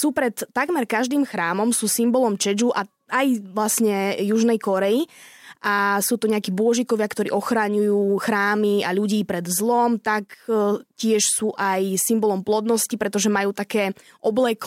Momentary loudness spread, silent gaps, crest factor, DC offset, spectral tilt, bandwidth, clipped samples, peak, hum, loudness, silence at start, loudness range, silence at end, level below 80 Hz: 5 LU; none; 14 dB; under 0.1%; -4 dB/octave; 16.5 kHz; under 0.1%; -8 dBFS; none; -21 LUFS; 0 s; 1 LU; 0 s; -68 dBFS